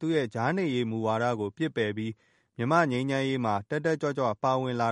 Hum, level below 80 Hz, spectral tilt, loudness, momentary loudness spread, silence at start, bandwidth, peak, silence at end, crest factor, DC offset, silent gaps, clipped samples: none; -68 dBFS; -6.5 dB/octave; -28 LUFS; 6 LU; 0 s; 10.5 kHz; -10 dBFS; 0 s; 20 dB; under 0.1%; none; under 0.1%